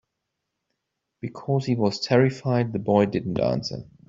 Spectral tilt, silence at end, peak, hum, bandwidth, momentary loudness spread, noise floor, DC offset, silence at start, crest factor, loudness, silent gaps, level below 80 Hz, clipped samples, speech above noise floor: -7 dB/octave; 0.25 s; -6 dBFS; none; 7.6 kHz; 13 LU; -81 dBFS; under 0.1%; 1.25 s; 20 dB; -23 LUFS; none; -58 dBFS; under 0.1%; 58 dB